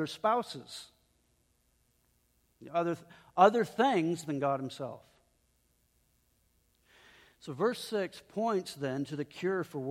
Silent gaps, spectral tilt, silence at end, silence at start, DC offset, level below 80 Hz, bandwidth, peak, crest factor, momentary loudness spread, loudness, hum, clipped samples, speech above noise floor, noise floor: none; -5.5 dB/octave; 0 s; 0 s; under 0.1%; -76 dBFS; 16 kHz; -10 dBFS; 24 dB; 18 LU; -32 LUFS; none; under 0.1%; 41 dB; -73 dBFS